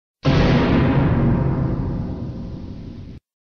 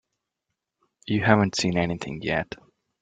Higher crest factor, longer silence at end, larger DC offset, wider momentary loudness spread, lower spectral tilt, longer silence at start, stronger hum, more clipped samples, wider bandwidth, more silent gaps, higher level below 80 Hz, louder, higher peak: second, 14 dB vs 24 dB; about the same, 0.4 s vs 0.45 s; first, 0.3% vs under 0.1%; about the same, 18 LU vs 18 LU; first, -8.5 dB/octave vs -5.5 dB/octave; second, 0.25 s vs 1.05 s; neither; neither; second, 6.6 kHz vs 9.4 kHz; neither; first, -30 dBFS vs -54 dBFS; first, -19 LUFS vs -24 LUFS; second, -6 dBFS vs -2 dBFS